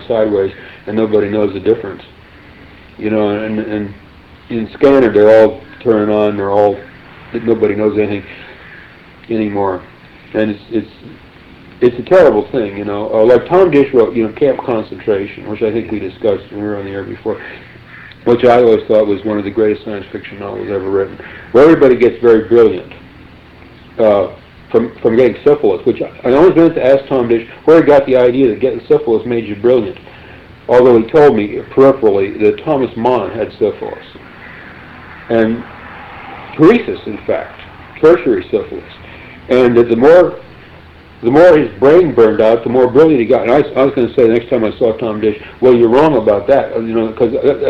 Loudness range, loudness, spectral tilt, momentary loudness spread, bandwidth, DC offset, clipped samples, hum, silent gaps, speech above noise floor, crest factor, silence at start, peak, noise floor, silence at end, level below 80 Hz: 8 LU; -12 LUFS; -8.5 dB/octave; 17 LU; 6.8 kHz; under 0.1%; under 0.1%; none; none; 27 dB; 12 dB; 0 s; 0 dBFS; -38 dBFS; 0 s; -44 dBFS